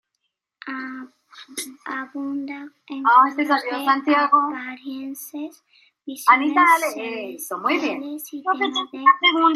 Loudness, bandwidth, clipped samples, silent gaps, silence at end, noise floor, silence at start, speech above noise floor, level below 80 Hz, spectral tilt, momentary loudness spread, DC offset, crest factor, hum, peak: -20 LUFS; 16 kHz; under 0.1%; none; 0 s; -77 dBFS; 0.65 s; 56 dB; -84 dBFS; -1.5 dB/octave; 19 LU; under 0.1%; 20 dB; none; -2 dBFS